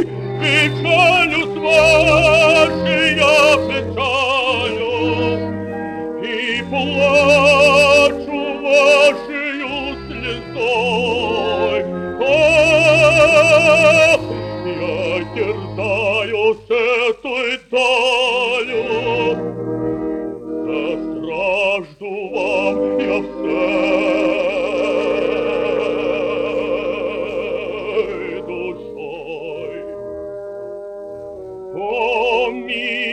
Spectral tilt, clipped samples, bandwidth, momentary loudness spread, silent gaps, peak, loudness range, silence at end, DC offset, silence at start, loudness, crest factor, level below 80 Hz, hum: -4.5 dB/octave; under 0.1%; 12.5 kHz; 16 LU; none; 0 dBFS; 11 LU; 0 s; under 0.1%; 0 s; -15 LUFS; 16 dB; -44 dBFS; none